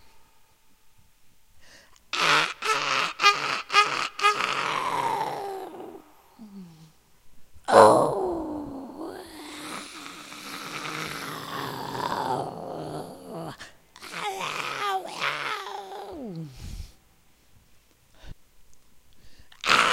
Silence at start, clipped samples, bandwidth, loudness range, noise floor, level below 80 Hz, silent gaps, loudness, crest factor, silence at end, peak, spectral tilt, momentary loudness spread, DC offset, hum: 0.05 s; under 0.1%; 16 kHz; 12 LU; -59 dBFS; -56 dBFS; none; -25 LUFS; 28 dB; 0 s; 0 dBFS; -3 dB/octave; 20 LU; under 0.1%; none